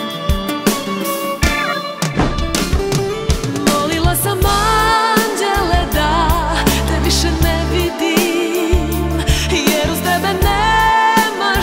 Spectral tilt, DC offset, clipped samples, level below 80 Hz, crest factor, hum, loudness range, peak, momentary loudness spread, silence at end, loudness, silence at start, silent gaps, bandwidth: -4 dB/octave; under 0.1%; under 0.1%; -22 dBFS; 14 dB; none; 3 LU; 0 dBFS; 6 LU; 0 s; -15 LUFS; 0 s; none; 16.5 kHz